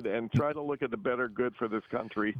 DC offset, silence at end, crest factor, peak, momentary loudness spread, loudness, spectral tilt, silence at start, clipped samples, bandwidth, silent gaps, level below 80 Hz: under 0.1%; 0 s; 16 dB; -16 dBFS; 5 LU; -32 LUFS; -8.5 dB/octave; 0 s; under 0.1%; 7.4 kHz; none; -64 dBFS